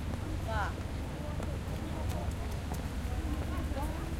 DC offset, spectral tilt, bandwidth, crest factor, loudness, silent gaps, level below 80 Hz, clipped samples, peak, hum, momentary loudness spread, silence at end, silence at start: under 0.1%; -6 dB/octave; 16.5 kHz; 14 dB; -37 LUFS; none; -38 dBFS; under 0.1%; -22 dBFS; none; 3 LU; 0 s; 0 s